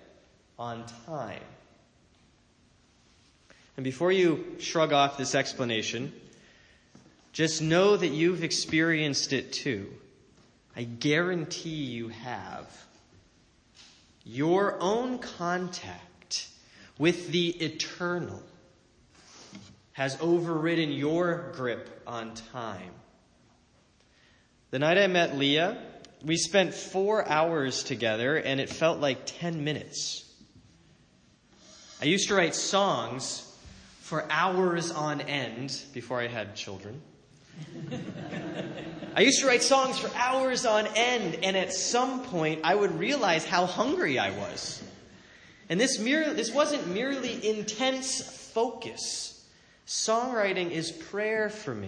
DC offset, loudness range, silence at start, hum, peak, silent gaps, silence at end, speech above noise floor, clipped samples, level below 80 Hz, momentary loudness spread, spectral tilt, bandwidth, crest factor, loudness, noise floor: under 0.1%; 8 LU; 0.6 s; none; -8 dBFS; none; 0 s; 35 dB; under 0.1%; -68 dBFS; 15 LU; -3.5 dB/octave; 10.5 kHz; 22 dB; -28 LUFS; -63 dBFS